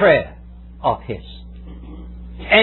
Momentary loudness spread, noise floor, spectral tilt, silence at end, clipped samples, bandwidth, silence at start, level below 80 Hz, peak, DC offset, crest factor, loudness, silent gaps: 23 LU; -35 dBFS; -8 dB/octave; 0 s; under 0.1%; 4.2 kHz; 0 s; -36 dBFS; 0 dBFS; under 0.1%; 20 dB; -20 LUFS; none